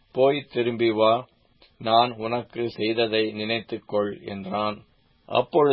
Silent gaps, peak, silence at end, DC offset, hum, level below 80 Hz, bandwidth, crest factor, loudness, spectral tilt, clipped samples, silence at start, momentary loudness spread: none; -4 dBFS; 0 s; under 0.1%; none; -64 dBFS; 5.8 kHz; 20 dB; -24 LUFS; -10 dB/octave; under 0.1%; 0.15 s; 9 LU